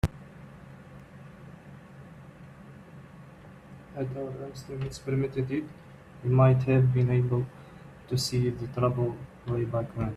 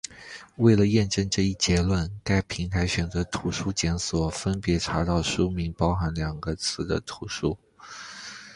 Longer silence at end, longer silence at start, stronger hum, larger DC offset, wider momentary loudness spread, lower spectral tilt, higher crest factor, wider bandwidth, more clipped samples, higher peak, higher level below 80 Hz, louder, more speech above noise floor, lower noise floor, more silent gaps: about the same, 0 s vs 0 s; about the same, 0.05 s vs 0.1 s; neither; neither; first, 26 LU vs 16 LU; first, -7 dB/octave vs -5 dB/octave; about the same, 20 dB vs 20 dB; about the same, 12.5 kHz vs 11.5 kHz; neither; second, -10 dBFS vs -6 dBFS; second, -52 dBFS vs -38 dBFS; about the same, -28 LUFS vs -26 LUFS; about the same, 22 dB vs 20 dB; first, -49 dBFS vs -45 dBFS; neither